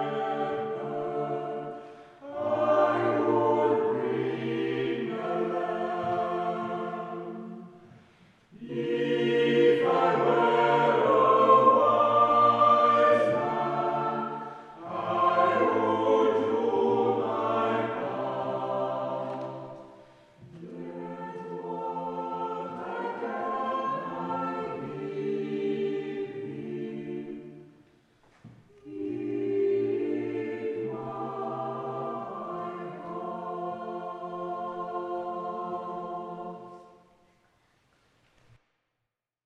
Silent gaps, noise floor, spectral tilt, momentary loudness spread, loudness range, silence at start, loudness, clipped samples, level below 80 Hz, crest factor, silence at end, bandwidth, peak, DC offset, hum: none; -85 dBFS; -7 dB/octave; 17 LU; 15 LU; 0 s; -28 LUFS; under 0.1%; -72 dBFS; 20 dB; 2.6 s; 8.4 kHz; -8 dBFS; under 0.1%; none